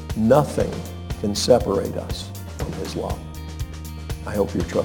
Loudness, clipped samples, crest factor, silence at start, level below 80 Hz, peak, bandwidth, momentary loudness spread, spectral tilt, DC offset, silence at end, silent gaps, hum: -23 LUFS; under 0.1%; 20 dB; 0 s; -36 dBFS; -2 dBFS; 19 kHz; 15 LU; -5.5 dB/octave; under 0.1%; 0 s; none; none